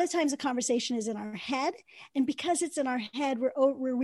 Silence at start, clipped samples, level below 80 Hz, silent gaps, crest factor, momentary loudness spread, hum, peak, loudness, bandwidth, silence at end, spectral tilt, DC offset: 0 s; under 0.1%; -78 dBFS; none; 16 dB; 7 LU; none; -14 dBFS; -30 LUFS; 12.5 kHz; 0 s; -3 dB/octave; under 0.1%